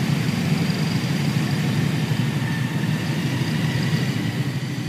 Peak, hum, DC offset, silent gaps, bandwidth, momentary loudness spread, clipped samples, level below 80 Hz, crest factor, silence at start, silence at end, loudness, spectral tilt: -8 dBFS; none; under 0.1%; none; 15.5 kHz; 2 LU; under 0.1%; -52 dBFS; 14 dB; 0 s; 0 s; -23 LUFS; -6 dB/octave